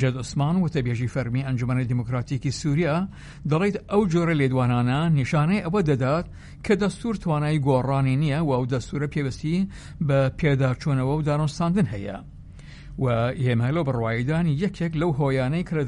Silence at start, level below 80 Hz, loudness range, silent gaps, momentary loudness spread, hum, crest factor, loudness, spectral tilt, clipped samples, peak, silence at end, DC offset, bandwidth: 0 s; -44 dBFS; 3 LU; none; 6 LU; none; 16 dB; -24 LUFS; -7.5 dB/octave; under 0.1%; -8 dBFS; 0 s; under 0.1%; 11 kHz